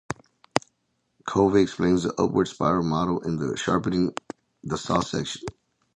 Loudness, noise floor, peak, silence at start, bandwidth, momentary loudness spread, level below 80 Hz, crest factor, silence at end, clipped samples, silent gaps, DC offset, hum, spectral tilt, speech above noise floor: -25 LUFS; -74 dBFS; 0 dBFS; 0.1 s; 11 kHz; 16 LU; -50 dBFS; 26 dB; 0.45 s; under 0.1%; none; under 0.1%; none; -6 dB/octave; 50 dB